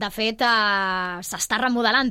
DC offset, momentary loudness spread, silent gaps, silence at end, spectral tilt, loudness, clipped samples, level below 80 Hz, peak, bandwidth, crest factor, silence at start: under 0.1%; 8 LU; none; 0 s; -2 dB/octave; -21 LUFS; under 0.1%; -54 dBFS; -6 dBFS; 16.5 kHz; 16 dB; 0 s